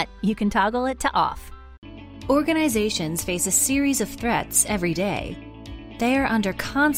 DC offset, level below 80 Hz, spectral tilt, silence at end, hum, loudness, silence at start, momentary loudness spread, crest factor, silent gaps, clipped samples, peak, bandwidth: under 0.1%; -42 dBFS; -3.5 dB/octave; 0 s; none; -22 LUFS; 0 s; 18 LU; 18 dB; 1.78-1.82 s; under 0.1%; -6 dBFS; 16 kHz